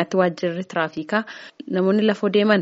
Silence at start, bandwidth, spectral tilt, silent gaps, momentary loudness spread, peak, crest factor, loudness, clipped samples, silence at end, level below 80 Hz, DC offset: 0 s; 8 kHz; -4.5 dB/octave; none; 9 LU; -2 dBFS; 20 dB; -21 LUFS; under 0.1%; 0 s; -70 dBFS; under 0.1%